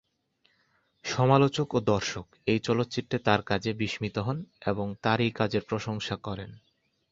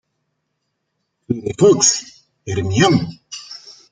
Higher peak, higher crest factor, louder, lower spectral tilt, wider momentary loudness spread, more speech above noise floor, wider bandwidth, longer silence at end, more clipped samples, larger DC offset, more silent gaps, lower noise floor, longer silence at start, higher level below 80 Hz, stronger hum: second, -6 dBFS vs -2 dBFS; first, 24 dB vs 18 dB; second, -28 LUFS vs -16 LUFS; first, -6 dB/octave vs -4 dB/octave; second, 11 LU vs 22 LU; second, 43 dB vs 58 dB; second, 7.8 kHz vs 10 kHz; first, 0.55 s vs 0.2 s; neither; neither; neither; about the same, -71 dBFS vs -73 dBFS; second, 1.05 s vs 1.3 s; about the same, -56 dBFS vs -54 dBFS; neither